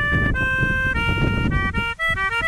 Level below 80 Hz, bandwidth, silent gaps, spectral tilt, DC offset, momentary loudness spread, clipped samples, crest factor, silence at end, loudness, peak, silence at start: -28 dBFS; 13.5 kHz; none; -6 dB/octave; under 0.1%; 2 LU; under 0.1%; 14 dB; 0 s; -20 LUFS; -6 dBFS; 0 s